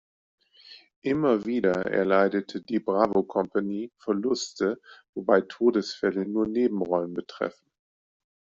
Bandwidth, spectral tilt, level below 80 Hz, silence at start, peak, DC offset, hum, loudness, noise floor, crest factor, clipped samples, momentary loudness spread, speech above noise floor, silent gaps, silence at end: 7.6 kHz; -5 dB/octave; -66 dBFS; 0.7 s; -6 dBFS; under 0.1%; none; -26 LUFS; -52 dBFS; 20 dB; under 0.1%; 10 LU; 26 dB; 0.96-1.02 s, 5.09-5.13 s; 0.9 s